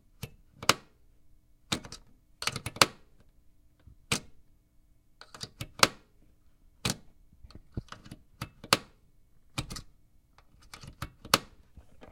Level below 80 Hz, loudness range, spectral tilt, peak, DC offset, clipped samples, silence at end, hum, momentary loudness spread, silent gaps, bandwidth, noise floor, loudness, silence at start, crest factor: -56 dBFS; 5 LU; -2 dB/octave; 0 dBFS; under 0.1%; under 0.1%; 0.05 s; none; 23 LU; none; 16.5 kHz; -63 dBFS; -30 LUFS; 0.25 s; 36 dB